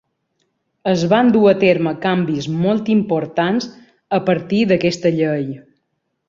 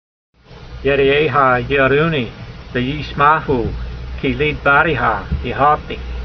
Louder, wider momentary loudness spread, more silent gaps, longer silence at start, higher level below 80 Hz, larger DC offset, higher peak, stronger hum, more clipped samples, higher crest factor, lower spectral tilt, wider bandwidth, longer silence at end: about the same, -17 LUFS vs -16 LUFS; about the same, 10 LU vs 12 LU; neither; first, 0.85 s vs 0.5 s; second, -56 dBFS vs -30 dBFS; neither; about the same, -2 dBFS vs 0 dBFS; neither; neither; about the same, 16 dB vs 16 dB; about the same, -7 dB/octave vs -7.5 dB/octave; first, 7.6 kHz vs 6.4 kHz; first, 0.7 s vs 0 s